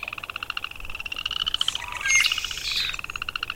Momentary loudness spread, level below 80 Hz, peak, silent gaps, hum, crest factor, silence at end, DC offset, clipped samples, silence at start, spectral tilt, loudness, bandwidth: 13 LU; -46 dBFS; -6 dBFS; none; none; 22 dB; 0 s; under 0.1%; under 0.1%; 0 s; 1.5 dB/octave; -25 LUFS; 17 kHz